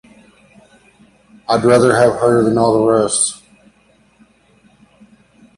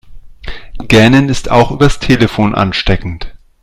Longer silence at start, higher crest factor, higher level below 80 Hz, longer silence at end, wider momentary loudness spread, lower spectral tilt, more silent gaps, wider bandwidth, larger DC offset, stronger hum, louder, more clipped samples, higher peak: first, 1.5 s vs 0.05 s; about the same, 16 dB vs 12 dB; second, -52 dBFS vs -24 dBFS; first, 2.25 s vs 0.25 s; second, 8 LU vs 22 LU; second, -4.5 dB/octave vs -6 dB/octave; neither; second, 11.5 kHz vs 15 kHz; neither; neither; second, -13 LUFS vs -10 LUFS; second, under 0.1% vs 0.6%; about the same, 0 dBFS vs 0 dBFS